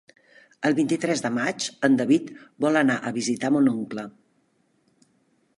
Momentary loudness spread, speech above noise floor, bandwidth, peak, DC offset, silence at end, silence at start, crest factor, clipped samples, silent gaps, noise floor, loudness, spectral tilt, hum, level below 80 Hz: 11 LU; 44 dB; 11.5 kHz; -6 dBFS; under 0.1%; 1.5 s; 0.6 s; 18 dB; under 0.1%; none; -67 dBFS; -23 LUFS; -4.5 dB/octave; none; -74 dBFS